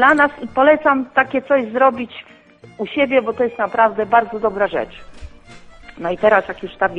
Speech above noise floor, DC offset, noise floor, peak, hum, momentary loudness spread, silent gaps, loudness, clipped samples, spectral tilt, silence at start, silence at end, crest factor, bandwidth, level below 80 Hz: 24 dB; under 0.1%; -41 dBFS; 0 dBFS; none; 14 LU; none; -17 LUFS; under 0.1%; -6 dB/octave; 0 s; 0 s; 18 dB; 8.8 kHz; -48 dBFS